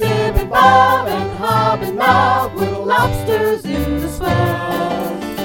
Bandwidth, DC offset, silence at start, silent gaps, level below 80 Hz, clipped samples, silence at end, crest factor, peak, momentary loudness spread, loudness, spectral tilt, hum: 17 kHz; under 0.1%; 0 s; none; -30 dBFS; under 0.1%; 0 s; 16 dB; 0 dBFS; 9 LU; -15 LUFS; -5.5 dB/octave; none